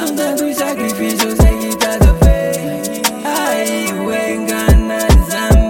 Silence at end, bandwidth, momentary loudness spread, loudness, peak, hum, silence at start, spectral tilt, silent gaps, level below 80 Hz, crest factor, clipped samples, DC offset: 0 s; 17 kHz; 6 LU; -14 LUFS; 0 dBFS; none; 0 s; -5 dB/octave; none; -16 dBFS; 12 dB; under 0.1%; under 0.1%